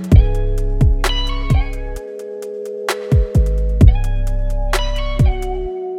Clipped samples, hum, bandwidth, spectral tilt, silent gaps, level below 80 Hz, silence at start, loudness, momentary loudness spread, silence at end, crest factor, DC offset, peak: under 0.1%; none; 14.5 kHz; -6.5 dB/octave; none; -16 dBFS; 0 s; -18 LUFS; 14 LU; 0 s; 14 dB; under 0.1%; 0 dBFS